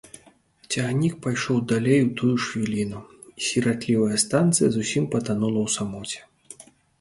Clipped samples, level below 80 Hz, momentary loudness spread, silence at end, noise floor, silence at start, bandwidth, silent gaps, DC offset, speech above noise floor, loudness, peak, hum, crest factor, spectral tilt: under 0.1%; -58 dBFS; 14 LU; 0.4 s; -56 dBFS; 0.15 s; 11.5 kHz; none; under 0.1%; 33 dB; -23 LUFS; -6 dBFS; none; 18 dB; -5 dB/octave